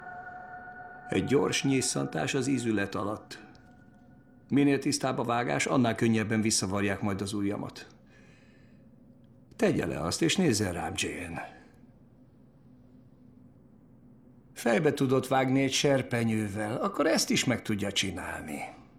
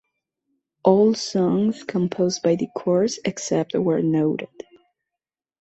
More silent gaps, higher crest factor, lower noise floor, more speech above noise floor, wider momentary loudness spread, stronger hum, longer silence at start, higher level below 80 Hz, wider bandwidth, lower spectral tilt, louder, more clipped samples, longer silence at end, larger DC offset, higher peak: neither; about the same, 18 dB vs 20 dB; second, -57 dBFS vs -88 dBFS; second, 29 dB vs 67 dB; first, 16 LU vs 7 LU; neither; second, 0 s vs 0.85 s; about the same, -62 dBFS vs -64 dBFS; first, 16 kHz vs 8.2 kHz; second, -4.5 dB/octave vs -6 dB/octave; second, -28 LUFS vs -21 LUFS; neither; second, 0.15 s vs 1 s; neither; second, -12 dBFS vs -2 dBFS